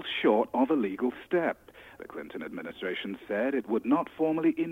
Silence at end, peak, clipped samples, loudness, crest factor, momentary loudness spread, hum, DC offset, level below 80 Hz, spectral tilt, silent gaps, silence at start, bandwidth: 0 s; -12 dBFS; under 0.1%; -29 LUFS; 18 dB; 14 LU; none; under 0.1%; -68 dBFS; -7 dB/octave; none; 0 s; 15.5 kHz